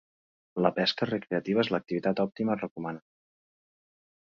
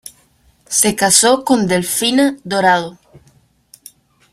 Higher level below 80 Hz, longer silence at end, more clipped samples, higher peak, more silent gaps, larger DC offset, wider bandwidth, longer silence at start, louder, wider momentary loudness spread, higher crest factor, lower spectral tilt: second, -70 dBFS vs -54 dBFS; second, 1.25 s vs 1.4 s; neither; second, -6 dBFS vs 0 dBFS; first, 2.71-2.76 s vs none; neither; second, 7.2 kHz vs 16 kHz; first, 0.55 s vs 0.05 s; second, -29 LUFS vs -13 LUFS; first, 12 LU vs 7 LU; first, 24 dB vs 16 dB; first, -6.5 dB/octave vs -2.5 dB/octave